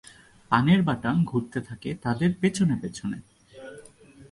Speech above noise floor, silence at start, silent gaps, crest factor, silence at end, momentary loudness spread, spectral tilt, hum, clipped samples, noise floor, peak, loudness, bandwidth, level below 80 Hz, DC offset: 26 dB; 0.5 s; none; 20 dB; 0.1 s; 21 LU; -6.5 dB/octave; none; under 0.1%; -51 dBFS; -6 dBFS; -25 LUFS; 11.5 kHz; -56 dBFS; under 0.1%